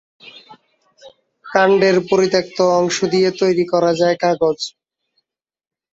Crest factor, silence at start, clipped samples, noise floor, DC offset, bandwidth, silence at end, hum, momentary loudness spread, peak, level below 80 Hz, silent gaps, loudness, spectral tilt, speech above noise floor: 16 dB; 1.05 s; under 0.1%; -71 dBFS; under 0.1%; 7.8 kHz; 1.25 s; none; 5 LU; -2 dBFS; -60 dBFS; none; -16 LUFS; -5 dB/octave; 56 dB